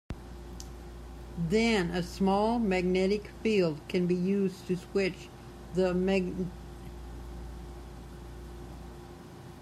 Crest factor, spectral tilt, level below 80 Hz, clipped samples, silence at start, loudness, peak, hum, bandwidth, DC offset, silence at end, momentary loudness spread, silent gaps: 16 dB; -6.5 dB/octave; -46 dBFS; under 0.1%; 0.1 s; -29 LUFS; -16 dBFS; none; 13.5 kHz; under 0.1%; 0 s; 19 LU; none